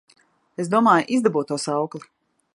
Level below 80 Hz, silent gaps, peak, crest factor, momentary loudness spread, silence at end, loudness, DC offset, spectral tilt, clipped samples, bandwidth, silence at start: -74 dBFS; none; -4 dBFS; 18 dB; 17 LU; 0.55 s; -21 LUFS; under 0.1%; -5.5 dB/octave; under 0.1%; 11.5 kHz; 0.6 s